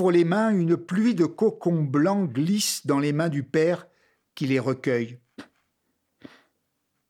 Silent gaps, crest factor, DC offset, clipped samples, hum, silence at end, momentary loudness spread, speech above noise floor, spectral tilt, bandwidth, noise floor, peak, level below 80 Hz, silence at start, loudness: none; 16 dB; under 0.1%; under 0.1%; none; 1.65 s; 5 LU; 53 dB; -6 dB/octave; 16.5 kHz; -76 dBFS; -10 dBFS; -76 dBFS; 0 s; -24 LUFS